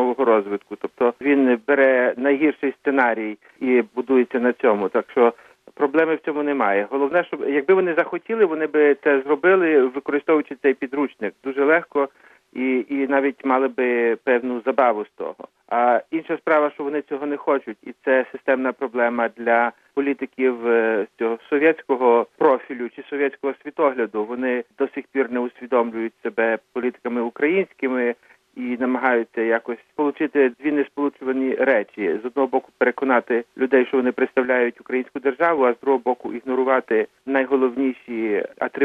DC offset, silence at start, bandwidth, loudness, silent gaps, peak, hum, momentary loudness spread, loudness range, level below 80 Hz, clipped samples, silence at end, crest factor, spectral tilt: under 0.1%; 0 s; 4.3 kHz; -21 LUFS; none; -4 dBFS; none; 9 LU; 4 LU; -74 dBFS; under 0.1%; 0 s; 16 dB; -7.5 dB/octave